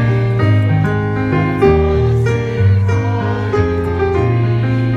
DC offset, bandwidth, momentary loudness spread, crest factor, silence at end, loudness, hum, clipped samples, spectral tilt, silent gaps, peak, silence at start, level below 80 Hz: under 0.1%; 6.8 kHz; 4 LU; 14 dB; 0 s; -14 LUFS; none; under 0.1%; -8.5 dB/octave; none; 0 dBFS; 0 s; -28 dBFS